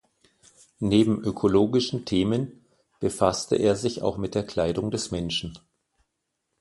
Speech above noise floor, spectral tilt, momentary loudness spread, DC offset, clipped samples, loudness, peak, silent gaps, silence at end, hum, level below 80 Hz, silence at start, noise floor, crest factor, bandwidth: 55 dB; -5.5 dB/octave; 9 LU; under 0.1%; under 0.1%; -25 LUFS; -4 dBFS; none; 1.05 s; none; -50 dBFS; 0.8 s; -79 dBFS; 22 dB; 11.5 kHz